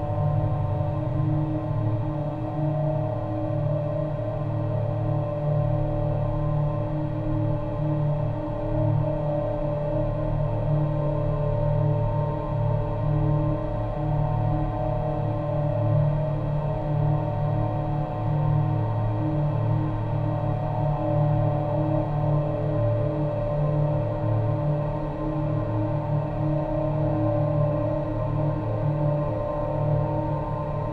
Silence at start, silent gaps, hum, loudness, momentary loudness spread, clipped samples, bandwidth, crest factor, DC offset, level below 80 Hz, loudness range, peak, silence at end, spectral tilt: 0 s; none; none; -26 LUFS; 4 LU; under 0.1%; 4.5 kHz; 12 dB; 0.2%; -36 dBFS; 2 LU; -12 dBFS; 0 s; -11 dB/octave